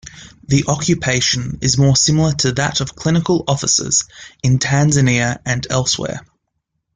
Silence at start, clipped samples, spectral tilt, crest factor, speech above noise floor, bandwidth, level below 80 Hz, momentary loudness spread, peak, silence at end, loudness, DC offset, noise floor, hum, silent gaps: 0.05 s; under 0.1%; -4 dB/octave; 16 dB; 57 dB; 9.6 kHz; -42 dBFS; 7 LU; -2 dBFS; 0.75 s; -16 LUFS; under 0.1%; -73 dBFS; none; none